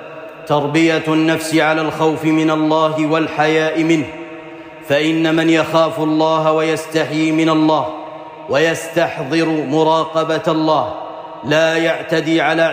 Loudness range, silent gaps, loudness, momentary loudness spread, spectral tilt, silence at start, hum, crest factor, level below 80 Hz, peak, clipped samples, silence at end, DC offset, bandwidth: 2 LU; none; -15 LUFS; 14 LU; -5.5 dB/octave; 0 s; none; 12 dB; -60 dBFS; -4 dBFS; under 0.1%; 0 s; under 0.1%; 15.5 kHz